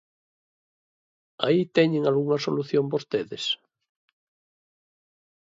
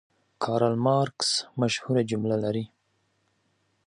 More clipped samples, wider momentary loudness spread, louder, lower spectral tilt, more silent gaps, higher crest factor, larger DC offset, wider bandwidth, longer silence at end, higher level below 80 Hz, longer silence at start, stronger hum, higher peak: neither; about the same, 7 LU vs 8 LU; about the same, -25 LUFS vs -26 LUFS; about the same, -6 dB/octave vs -5 dB/octave; neither; about the same, 22 dB vs 18 dB; neither; second, 7.8 kHz vs 11.5 kHz; first, 1.95 s vs 1.2 s; second, -72 dBFS vs -66 dBFS; first, 1.4 s vs 0.4 s; neither; first, -6 dBFS vs -10 dBFS